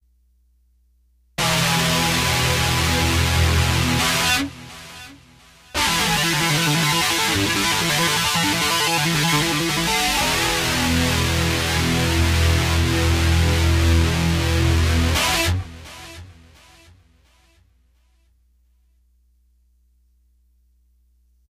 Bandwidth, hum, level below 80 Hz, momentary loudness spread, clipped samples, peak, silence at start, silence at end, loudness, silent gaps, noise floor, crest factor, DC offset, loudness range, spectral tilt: 16 kHz; none; -30 dBFS; 5 LU; under 0.1%; -4 dBFS; 1.4 s; 5.2 s; -18 LUFS; none; -60 dBFS; 16 dB; under 0.1%; 3 LU; -3.5 dB/octave